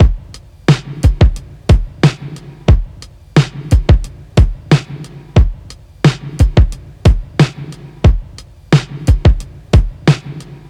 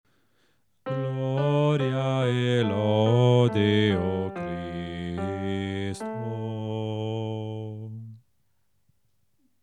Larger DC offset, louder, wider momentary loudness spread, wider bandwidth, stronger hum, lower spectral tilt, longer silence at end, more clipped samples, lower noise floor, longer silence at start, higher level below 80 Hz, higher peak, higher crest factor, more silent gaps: neither; first, -14 LUFS vs -26 LUFS; about the same, 13 LU vs 13 LU; about the same, 11.5 kHz vs 10.5 kHz; neither; about the same, -7 dB/octave vs -7.5 dB/octave; second, 0.15 s vs 1.45 s; neither; second, -35 dBFS vs -75 dBFS; second, 0 s vs 0.85 s; first, -16 dBFS vs -64 dBFS; first, 0 dBFS vs -8 dBFS; second, 12 dB vs 18 dB; neither